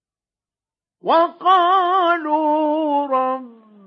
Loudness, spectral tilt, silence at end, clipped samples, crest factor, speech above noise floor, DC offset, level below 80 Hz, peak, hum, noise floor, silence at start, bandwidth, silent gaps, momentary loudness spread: -17 LUFS; -5.5 dB/octave; 0.35 s; under 0.1%; 14 dB; over 73 dB; under 0.1%; under -90 dBFS; -4 dBFS; none; under -90 dBFS; 1.05 s; 6.4 kHz; none; 7 LU